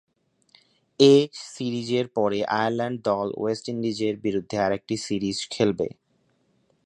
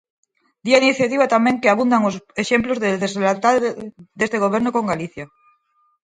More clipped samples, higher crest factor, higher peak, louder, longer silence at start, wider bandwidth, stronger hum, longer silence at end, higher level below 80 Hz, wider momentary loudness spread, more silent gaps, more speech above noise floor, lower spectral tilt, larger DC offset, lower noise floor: neither; about the same, 20 dB vs 20 dB; second, -4 dBFS vs 0 dBFS; second, -24 LUFS vs -18 LUFS; first, 1 s vs 0.65 s; about the same, 10.5 kHz vs 9.6 kHz; neither; first, 0.95 s vs 0.8 s; about the same, -62 dBFS vs -58 dBFS; second, 11 LU vs 15 LU; neither; about the same, 44 dB vs 45 dB; about the same, -5.5 dB/octave vs -5 dB/octave; neither; first, -68 dBFS vs -63 dBFS